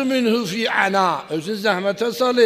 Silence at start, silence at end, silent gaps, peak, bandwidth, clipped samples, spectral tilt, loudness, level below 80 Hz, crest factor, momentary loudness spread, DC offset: 0 s; 0 s; none; -2 dBFS; 15.5 kHz; under 0.1%; -4.5 dB/octave; -20 LUFS; -66 dBFS; 16 dB; 4 LU; under 0.1%